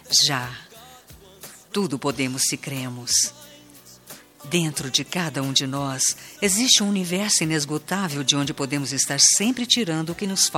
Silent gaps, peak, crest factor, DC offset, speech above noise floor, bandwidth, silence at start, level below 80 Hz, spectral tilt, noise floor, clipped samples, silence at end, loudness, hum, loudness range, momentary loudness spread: none; -2 dBFS; 22 dB; under 0.1%; 25 dB; 18 kHz; 0.05 s; -60 dBFS; -2 dB/octave; -48 dBFS; under 0.1%; 0 s; -21 LUFS; none; 6 LU; 12 LU